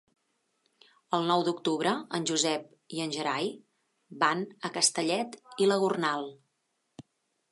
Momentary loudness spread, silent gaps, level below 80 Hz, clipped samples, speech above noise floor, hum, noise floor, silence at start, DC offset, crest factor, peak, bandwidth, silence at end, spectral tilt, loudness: 10 LU; none; -84 dBFS; under 0.1%; 49 dB; none; -78 dBFS; 1.1 s; under 0.1%; 22 dB; -10 dBFS; 11.5 kHz; 0.5 s; -3 dB/octave; -29 LUFS